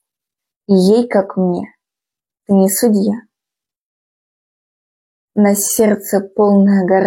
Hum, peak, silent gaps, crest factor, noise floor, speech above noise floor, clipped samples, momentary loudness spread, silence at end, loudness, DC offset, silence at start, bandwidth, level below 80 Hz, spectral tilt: none; -2 dBFS; 3.77-5.28 s; 14 dB; -87 dBFS; 75 dB; under 0.1%; 9 LU; 0 s; -14 LUFS; under 0.1%; 0.7 s; 16.5 kHz; -62 dBFS; -6 dB/octave